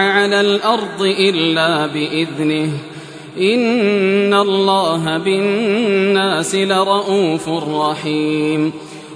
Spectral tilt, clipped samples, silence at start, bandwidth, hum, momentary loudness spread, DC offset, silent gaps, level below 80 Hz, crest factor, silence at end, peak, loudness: -5 dB/octave; under 0.1%; 0 s; 11 kHz; none; 6 LU; under 0.1%; none; -62 dBFS; 14 dB; 0 s; -2 dBFS; -15 LUFS